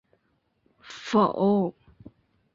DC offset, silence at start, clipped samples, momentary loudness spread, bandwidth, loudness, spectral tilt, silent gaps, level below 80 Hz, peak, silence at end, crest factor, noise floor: under 0.1%; 0.85 s; under 0.1%; 18 LU; 7.6 kHz; -24 LUFS; -7 dB/octave; none; -66 dBFS; -10 dBFS; 0.85 s; 18 dB; -72 dBFS